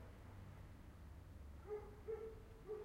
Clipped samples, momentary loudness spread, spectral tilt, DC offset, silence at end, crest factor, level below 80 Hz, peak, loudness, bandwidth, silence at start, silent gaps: under 0.1%; 9 LU; -7.5 dB/octave; under 0.1%; 0 s; 14 dB; -60 dBFS; -38 dBFS; -55 LUFS; 16 kHz; 0 s; none